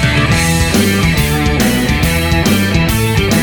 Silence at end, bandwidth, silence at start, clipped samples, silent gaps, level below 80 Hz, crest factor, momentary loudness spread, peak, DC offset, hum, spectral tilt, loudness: 0 s; over 20 kHz; 0 s; under 0.1%; none; -22 dBFS; 12 dB; 1 LU; 0 dBFS; 1%; none; -4.5 dB/octave; -12 LUFS